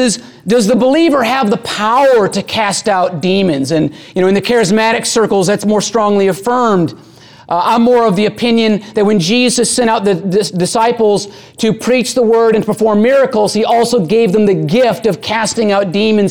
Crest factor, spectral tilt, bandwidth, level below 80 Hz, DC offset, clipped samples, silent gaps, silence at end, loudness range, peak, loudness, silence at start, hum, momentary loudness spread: 10 dB; -4.5 dB/octave; 18.5 kHz; -50 dBFS; 0.3%; under 0.1%; none; 0 s; 1 LU; -2 dBFS; -12 LUFS; 0 s; none; 5 LU